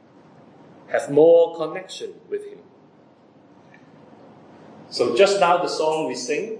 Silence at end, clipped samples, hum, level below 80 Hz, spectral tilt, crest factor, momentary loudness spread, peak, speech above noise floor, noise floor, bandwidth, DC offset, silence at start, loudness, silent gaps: 0 s; under 0.1%; none; -82 dBFS; -4 dB/octave; 20 dB; 18 LU; -4 dBFS; 33 dB; -52 dBFS; 10.5 kHz; under 0.1%; 0.9 s; -20 LUFS; none